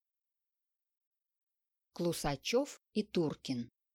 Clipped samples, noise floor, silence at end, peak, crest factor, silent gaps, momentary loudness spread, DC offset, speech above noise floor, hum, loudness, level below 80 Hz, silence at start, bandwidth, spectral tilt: under 0.1%; under -90 dBFS; 0.3 s; -22 dBFS; 18 dB; none; 7 LU; under 0.1%; over 54 dB; none; -37 LUFS; -62 dBFS; 1.95 s; 17.5 kHz; -5 dB/octave